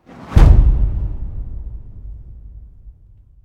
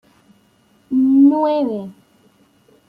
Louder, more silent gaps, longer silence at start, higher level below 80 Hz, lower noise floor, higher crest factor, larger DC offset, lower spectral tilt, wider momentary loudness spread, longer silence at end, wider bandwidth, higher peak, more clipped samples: about the same, -15 LUFS vs -15 LUFS; neither; second, 0.2 s vs 0.9 s; first, -16 dBFS vs -68 dBFS; second, -46 dBFS vs -56 dBFS; about the same, 16 dB vs 14 dB; neither; about the same, -8.5 dB/octave vs -8.5 dB/octave; first, 25 LU vs 16 LU; second, 0.55 s vs 0.95 s; first, 6.6 kHz vs 4.8 kHz; first, 0 dBFS vs -4 dBFS; first, 0.2% vs under 0.1%